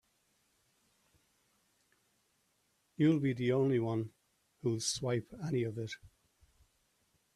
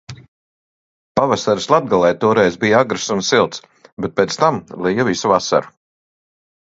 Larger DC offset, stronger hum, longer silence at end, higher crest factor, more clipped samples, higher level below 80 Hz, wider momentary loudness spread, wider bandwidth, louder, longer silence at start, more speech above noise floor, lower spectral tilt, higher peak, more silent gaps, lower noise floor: neither; neither; first, 1.3 s vs 1 s; about the same, 20 dB vs 18 dB; neither; second, -72 dBFS vs -54 dBFS; first, 13 LU vs 7 LU; first, 13.5 kHz vs 8 kHz; second, -34 LUFS vs -16 LUFS; first, 3 s vs 0.1 s; second, 44 dB vs over 74 dB; about the same, -5.5 dB/octave vs -4.5 dB/octave; second, -18 dBFS vs 0 dBFS; second, none vs 0.28-1.15 s, 3.92-3.97 s; second, -77 dBFS vs under -90 dBFS